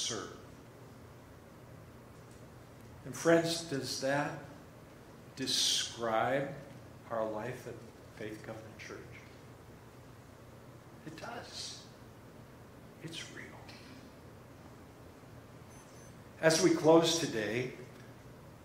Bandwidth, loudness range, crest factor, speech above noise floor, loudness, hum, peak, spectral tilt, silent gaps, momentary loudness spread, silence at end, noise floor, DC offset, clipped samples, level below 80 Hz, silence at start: 16 kHz; 18 LU; 24 dB; 21 dB; -33 LUFS; none; -12 dBFS; -3.5 dB/octave; none; 26 LU; 0 s; -54 dBFS; under 0.1%; under 0.1%; -66 dBFS; 0 s